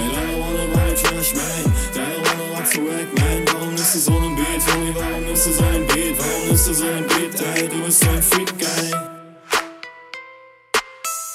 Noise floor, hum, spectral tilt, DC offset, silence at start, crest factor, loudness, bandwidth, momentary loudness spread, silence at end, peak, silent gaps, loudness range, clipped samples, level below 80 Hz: -45 dBFS; none; -3.5 dB/octave; under 0.1%; 0 s; 18 dB; -18 LUFS; 17 kHz; 8 LU; 0 s; -2 dBFS; none; 2 LU; under 0.1%; -28 dBFS